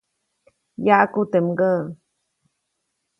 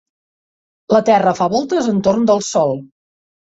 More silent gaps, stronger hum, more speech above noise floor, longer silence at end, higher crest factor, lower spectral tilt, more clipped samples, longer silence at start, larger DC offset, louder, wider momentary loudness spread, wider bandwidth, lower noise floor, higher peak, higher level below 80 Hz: neither; neither; second, 57 dB vs over 76 dB; first, 1.25 s vs 0.75 s; first, 22 dB vs 16 dB; first, -9 dB/octave vs -5.5 dB/octave; neither; about the same, 0.8 s vs 0.9 s; neither; second, -19 LUFS vs -15 LUFS; first, 8 LU vs 4 LU; second, 7.2 kHz vs 8 kHz; second, -76 dBFS vs under -90 dBFS; about the same, 0 dBFS vs -2 dBFS; second, -68 dBFS vs -56 dBFS